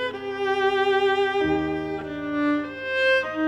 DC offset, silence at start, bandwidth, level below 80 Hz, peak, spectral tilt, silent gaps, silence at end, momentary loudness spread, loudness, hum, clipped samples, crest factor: under 0.1%; 0 s; 10 kHz; -52 dBFS; -10 dBFS; -5.5 dB/octave; none; 0 s; 8 LU; -23 LUFS; 50 Hz at -55 dBFS; under 0.1%; 14 dB